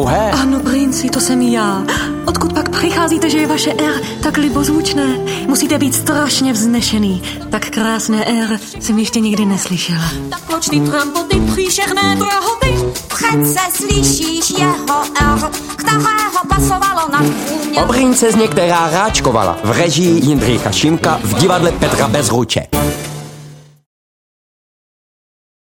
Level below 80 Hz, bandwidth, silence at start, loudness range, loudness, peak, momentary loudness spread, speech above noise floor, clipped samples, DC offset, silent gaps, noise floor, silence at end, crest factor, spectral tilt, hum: -30 dBFS; 17 kHz; 0 s; 3 LU; -14 LUFS; 0 dBFS; 5 LU; 22 dB; under 0.1%; under 0.1%; none; -36 dBFS; 2 s; 14 dB; -4 dB/octave; none